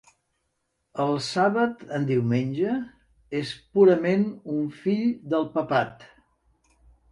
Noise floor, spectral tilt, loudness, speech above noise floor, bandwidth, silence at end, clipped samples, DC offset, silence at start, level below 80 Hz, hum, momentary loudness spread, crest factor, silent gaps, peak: -76 dBFS; -7 dB/octave; -25 LUFS; 52 dB; 11 kHz; 1.05 s; under 0.1%; under 0.1%; 0.95 s; -64 dBFS; none; 12 LU; 18 dB; none; -6 dBFS